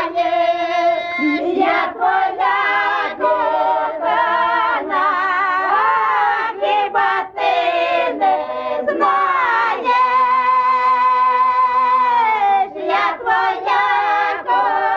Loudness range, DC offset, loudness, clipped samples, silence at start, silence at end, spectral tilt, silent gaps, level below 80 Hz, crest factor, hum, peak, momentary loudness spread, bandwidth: 2 LU; under 0.1%; -16 LUFS; under 0.1%; 0 s; 0 s; -4 dB/octave; none; -60 dBFS; 10 dB; none; -6 dBFS; 4 LU; 7.2 kHz